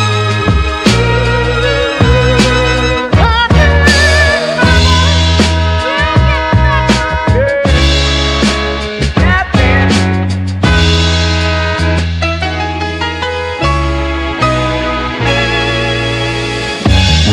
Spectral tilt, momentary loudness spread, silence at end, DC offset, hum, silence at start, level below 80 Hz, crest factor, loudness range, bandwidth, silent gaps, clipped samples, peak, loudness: -5 dB/octave; 7 LU; 0 s; under 0.1%; none; 0 s; -18 dBFS; 10 dB; 5 LU; 11.5 kHz; none; 0.6%; 0 dBFS; -11 LUFS